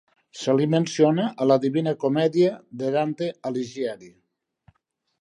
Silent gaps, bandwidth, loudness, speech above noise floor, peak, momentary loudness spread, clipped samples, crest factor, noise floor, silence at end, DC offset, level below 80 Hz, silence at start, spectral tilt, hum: none; 11 kHz; -23 LUFS; 50 dB; -6 dBFS; 10 LU; under 0.1%; 18 dB; -73 dBFS; 1.1 s; under 0.1%; -74 dBFS; 0.35 s; -6.5 dB/octave; none